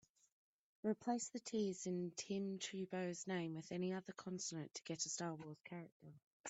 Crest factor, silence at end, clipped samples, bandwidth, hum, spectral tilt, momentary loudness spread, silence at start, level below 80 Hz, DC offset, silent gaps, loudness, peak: 18 dB; 0 s; under 0.1%; 8.2 kHz; none; -4.5 dB/octave; 11 LU; 0.85 s; -86 dBFS; under 0.1%; 5.92-6.00 s, 6.22-6.44 s; -46 LUFS; -28 dBFS